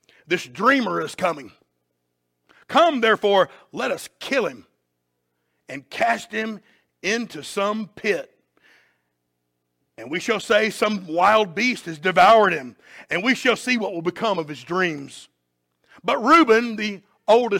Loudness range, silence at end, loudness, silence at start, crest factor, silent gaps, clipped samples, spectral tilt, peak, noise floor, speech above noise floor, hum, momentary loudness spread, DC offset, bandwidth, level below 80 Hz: 9 LU; 0 s; -21 LUFS; 0.3 s; 18 dB; none; under 0.1%; -4 dB/octave; -4 dBFS; -75 dBFS; 54 dB; 60 Hz at -55 dBFS; 14 LU; under 0.1%; 16.5 kHz; -66 dBFS